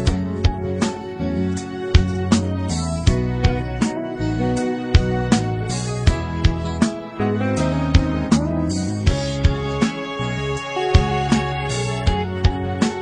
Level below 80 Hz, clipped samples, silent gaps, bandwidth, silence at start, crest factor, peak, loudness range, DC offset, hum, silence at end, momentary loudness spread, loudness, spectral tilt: -26 dBFS; under 0.1%; none; 10.5 kHz; 0 s; 20 dB; 0 dBFS; 1 LU; under 0.1%; none; 0 s; 5 LU; -21 LUFS; -6 dB/octave